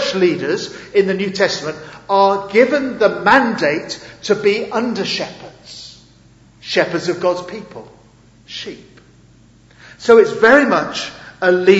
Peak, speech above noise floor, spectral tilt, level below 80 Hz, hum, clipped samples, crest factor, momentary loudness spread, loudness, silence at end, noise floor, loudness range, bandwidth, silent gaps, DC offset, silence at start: 0 dBFS; 32 dB; -4.5 dB/octave; -54 dBFS; none; under 0.1%; 16 dB; 21 LU; -15 LUFS; 0 s; -48 dBFS; 8 LU; 8 kHz; none; under 0.1%; 0 s